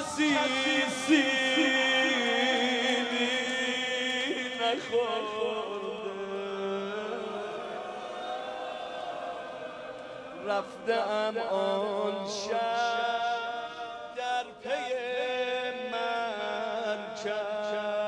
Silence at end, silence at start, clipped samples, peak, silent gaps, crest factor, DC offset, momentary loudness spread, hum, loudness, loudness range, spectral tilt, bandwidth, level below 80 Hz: 0 s; 0 s; under 0.1%; -12 dBFS; none; 18 dB; under 0.1%; 13 LU; none; -30 LUFS; 10 LU; -2.5 dB/octave; 11 kHz; -72 dBFS